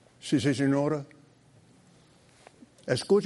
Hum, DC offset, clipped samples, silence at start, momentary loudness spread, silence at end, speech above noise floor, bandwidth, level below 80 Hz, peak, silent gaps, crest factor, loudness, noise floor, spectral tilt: none; under 0.1%; under 0.1%; 0.25 s; 15 LU; 0 s; 33 dB; 11.5 kHz; -70 dBFS; -12 dBFS; none; 18 dB; -28 LUFS; -59 dBFS; -6 dB/octave